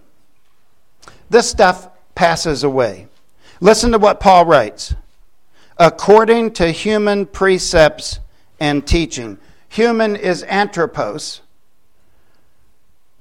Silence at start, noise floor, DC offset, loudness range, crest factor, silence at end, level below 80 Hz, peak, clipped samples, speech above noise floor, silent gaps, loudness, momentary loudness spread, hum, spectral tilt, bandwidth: 1.3 s; -63 dBFS; 0.7%; 7 LU; 16 dB; 1.85 s; -32 dBFS; 0 dBFS; under 0.1%; 49 dB; none; -14 LUFS; 17 LU; none; -4.5 dB/octave; 15.5 kHz